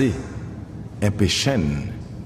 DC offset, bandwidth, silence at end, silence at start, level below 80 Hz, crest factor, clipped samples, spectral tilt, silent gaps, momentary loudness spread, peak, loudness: under 0.1%; 15.5 kHz; 0 s; 0 s; -38 dBFS; 18 dB; under 0.1%; -5 dB/octave; none; 15 LU; -6 dBFS; -23 LUFS